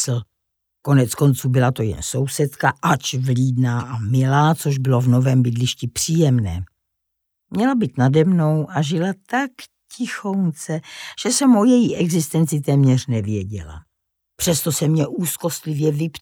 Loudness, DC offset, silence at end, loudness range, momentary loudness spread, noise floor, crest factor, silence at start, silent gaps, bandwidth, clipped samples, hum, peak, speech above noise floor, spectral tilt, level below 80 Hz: -19 LUFS; under 0.1%; 0.05 s; 3 LU; 11 LU; -77 dBFS; 16 dB; 0 s; none; 18 kHz; under 0.1%; none; -4 dBFS; 59 dB; -5.5 dB/octave; -48 dBFS